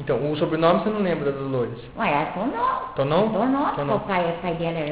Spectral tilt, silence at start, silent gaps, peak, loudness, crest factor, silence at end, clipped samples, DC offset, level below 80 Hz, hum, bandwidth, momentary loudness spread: -10.5 dB/octave; 0 s; none; -4 dBFS; -23 LUFS; 18 dB; 0 s; under 0.1%; 0.2%; -50 dBFS; none; 4 kHz; 6 LU